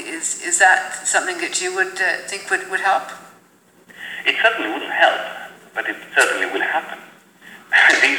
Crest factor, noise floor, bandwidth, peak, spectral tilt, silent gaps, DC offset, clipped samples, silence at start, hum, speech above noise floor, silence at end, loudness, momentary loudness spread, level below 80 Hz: 20 dB; -53 dBFS; over 20 kHz; 0 dBFS; 0.5 dB/octave; none; under 0.1%; under 0.1%; 0 s; none; 34 dB; 0 s; -18 LUFS; 16 LU; -78 dBFS